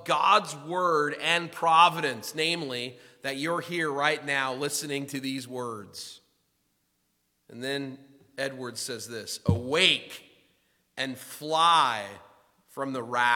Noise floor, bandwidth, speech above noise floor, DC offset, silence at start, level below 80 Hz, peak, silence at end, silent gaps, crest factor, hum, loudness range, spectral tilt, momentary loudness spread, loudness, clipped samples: -74 dBFS; 18 kHz; 47 dB; under 0.1%; 0 s; -66 dBFS; -4 dBFS; 0 s; none; 24 dB; none; 12 LU; -3 dB/octave; 17 LU; -27 LUFS; under 0.1%